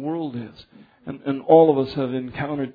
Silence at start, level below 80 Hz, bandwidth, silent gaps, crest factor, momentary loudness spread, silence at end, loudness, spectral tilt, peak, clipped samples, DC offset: 0 s; -58 dBFS; 5 kHz; none; 18 dB; 22 LU; 0.05 s; -20 LUFS; -10 dB/octave; -2 dBFS; under 0.1%; under 0.1%